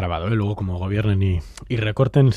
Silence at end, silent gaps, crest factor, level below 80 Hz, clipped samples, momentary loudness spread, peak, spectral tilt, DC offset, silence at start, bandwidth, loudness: 0 s; none; 16 dB; -40 dBFS; under 0.1%; 7 LU; -4 dBFS; -8 dB/octave; under 0.1%; 0 s; 10 kHz; -22 LUFS